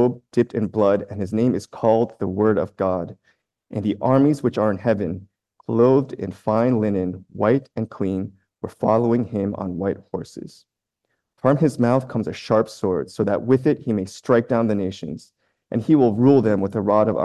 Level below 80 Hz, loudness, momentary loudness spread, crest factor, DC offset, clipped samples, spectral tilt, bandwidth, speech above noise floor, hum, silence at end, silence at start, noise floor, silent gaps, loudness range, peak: -52 dBFS; -21 LUFS; 13 LU; 18 dB; under 0.1%; under 0.1%; -8.5 dB/octave; 12 kHz; 56 dB; none; 0 s; 0 s; -76 dBFS; none; 4 LU; -4 dBFS